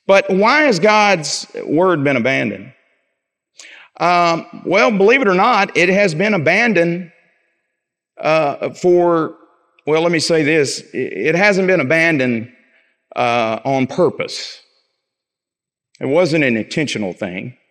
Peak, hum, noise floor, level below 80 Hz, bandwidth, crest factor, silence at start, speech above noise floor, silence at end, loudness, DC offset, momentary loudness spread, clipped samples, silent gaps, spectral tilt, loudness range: 0 dBFS; none; -86 dBFS; -68 dBFS; 11.5 kHz; 16 dB; 0.1 s; 71 dB; 0.2 s; -15 LUFS; under 0.1%; 12 LU; under 0.1%; none; -5 dB/octave; 6 LU